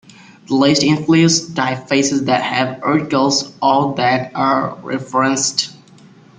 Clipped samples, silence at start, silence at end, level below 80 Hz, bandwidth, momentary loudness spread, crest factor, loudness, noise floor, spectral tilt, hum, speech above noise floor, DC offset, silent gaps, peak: under 0.1%; 0.5 s; 0.6 s; -56 dBFS; 9.6 kHz; 7 LU; 16 dB; -16 LUFS; -44 dBFS; -4 dB/octave; none; 29 dB; under 0.1%; none; 0 dBFS